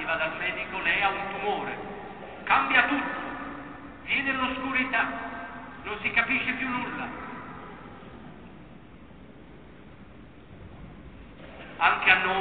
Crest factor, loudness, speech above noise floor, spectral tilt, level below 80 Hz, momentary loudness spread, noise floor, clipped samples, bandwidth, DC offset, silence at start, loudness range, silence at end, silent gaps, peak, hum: 26 dB; -26 LUFS; 22 dB; -7.5 dB/octave; -54 dBFS; 25 LU; -49 dBFS; under 0.1%; 4.6 kHz; 0.2%; 0 s; 21 LU; 0 s; none; -4 dBFS; none